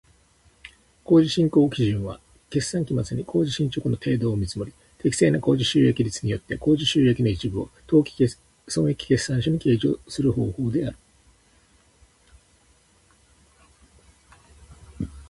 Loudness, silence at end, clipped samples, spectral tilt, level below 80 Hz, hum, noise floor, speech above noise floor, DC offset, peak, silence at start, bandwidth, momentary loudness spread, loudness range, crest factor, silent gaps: -23 LUFS; 0.05 s; under 0.1%; -6 dB/octave; -48 dBFS; none; -59 dBFS; 37 dB; under 0.1%; -6 dBFS; 1.1 s; 11.5 kHz; 10 LU; 8 LU; 18 dB; none